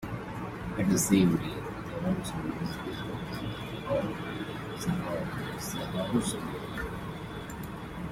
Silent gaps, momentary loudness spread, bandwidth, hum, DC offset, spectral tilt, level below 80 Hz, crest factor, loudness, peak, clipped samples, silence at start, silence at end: none; 12 LU; 16 kHz; none; under 0.1%; -5 dB/octave; -50 dBFS; 22 dB; -32 LUFS; -10 dBFS; under 0.1%; 0 s; 0 s